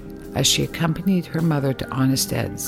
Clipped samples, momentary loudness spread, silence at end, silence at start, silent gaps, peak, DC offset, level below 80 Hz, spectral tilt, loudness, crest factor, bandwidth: under 0.1%; 5 LU; 0 s; 0 s; none; -6 dBFS; under 0.1%; -44 dBFS; -4.5 dB/octave; -21 LUFS; 16 dB; 17 kHz